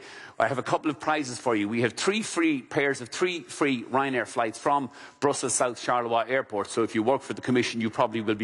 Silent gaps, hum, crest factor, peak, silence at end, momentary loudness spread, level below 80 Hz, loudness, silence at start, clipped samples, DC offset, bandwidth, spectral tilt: none; none; 16 dB; -10 dBFS; 0 s; 3 LU; -70 dBFS; -27 LUFS; 0 s; under 0.1%; under 0.1%; 11.5 kHz; -4 dB/octave